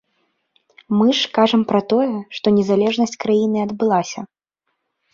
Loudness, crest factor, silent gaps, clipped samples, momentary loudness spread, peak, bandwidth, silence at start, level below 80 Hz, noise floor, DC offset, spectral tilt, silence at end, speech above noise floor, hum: -18 LUFS; 16 dB; none; under 0.1%; 7 LU; -2 dBFS; 7.4 kHz; 0.9 s; -62 dBFS; -74 dBFS; under 0.1%; -5.5 dB/octave; 0.9 s; 57 dB; none